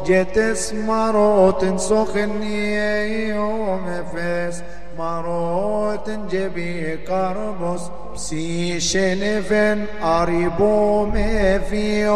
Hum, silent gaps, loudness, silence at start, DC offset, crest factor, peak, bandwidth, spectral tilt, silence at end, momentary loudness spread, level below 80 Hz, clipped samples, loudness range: none; none; -21 LUFS; 0 s; 5%; 16 dB; -4 dBFS; 12.5 kHz; -5 dB/octave; 0 s; 10 LU; -34 dBFS; under 0.1%; 6 LU